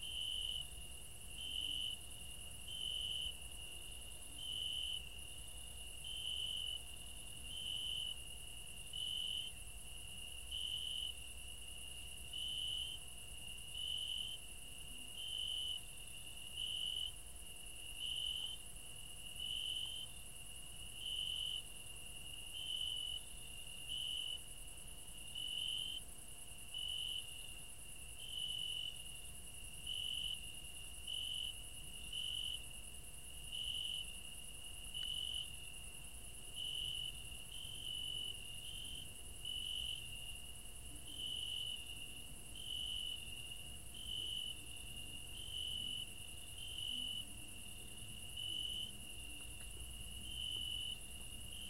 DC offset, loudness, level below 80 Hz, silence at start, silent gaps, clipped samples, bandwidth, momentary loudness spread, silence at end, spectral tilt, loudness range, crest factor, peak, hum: 0.2%; -44 LUFS; -58 dBFS; 0 s; none; under 0.1%; 16 kHz; 10 LU; 0 s; -0.5 dB/octave; 2 LU; 16 dB; -30 dBFS; none